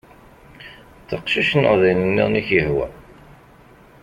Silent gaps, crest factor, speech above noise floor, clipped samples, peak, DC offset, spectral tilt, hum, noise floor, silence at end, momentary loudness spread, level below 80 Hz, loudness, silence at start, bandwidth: none; 20 dB; 30 dB; under 0.1%; -2 dBFS; under 0.1%; -7 dB/octave; none; -48 dBFS; 1 s; 22 LU; -46 dBFS; -18 LUFS; 0.6 s; 11.5 kHz